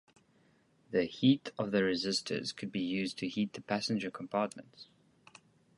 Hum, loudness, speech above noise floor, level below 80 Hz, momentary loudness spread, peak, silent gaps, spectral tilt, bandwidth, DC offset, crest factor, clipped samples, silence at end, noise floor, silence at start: none; -34 LUFS; 35 dB; -72 dBFS; 8 LU; -14 dBFS; none; -5 dB/octave; 11.5 kHz; under 0.1%; 20 dB; under 0.1%; 0.95 s; -69 dBFS; 0.9 s